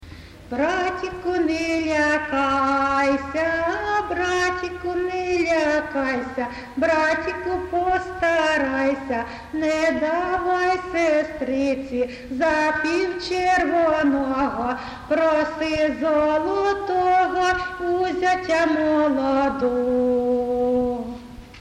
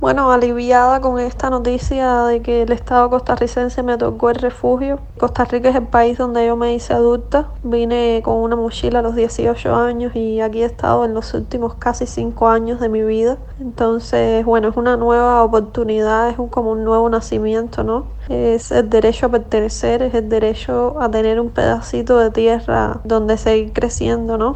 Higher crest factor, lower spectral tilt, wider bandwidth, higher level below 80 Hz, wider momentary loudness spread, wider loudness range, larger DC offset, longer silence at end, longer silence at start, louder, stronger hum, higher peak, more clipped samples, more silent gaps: about the same, 12 dB vs 16 dB; second, -4.5 dB/octave vs -6 dB/octave; first, 11.5 kHz vs 8.8 kHz; second, -46 dBFS vs -30 dBFS; about the same, 7 LU vs 6 LU; about the same, 2 LU vs 2 LU; neither; about the same, 0 s vs 0 s; about the same, 0 s vs 0 s; second, -22 LUFS vs -16 LUFS; neither; second, -10 dBFS vs 0 dBFS; neither; neither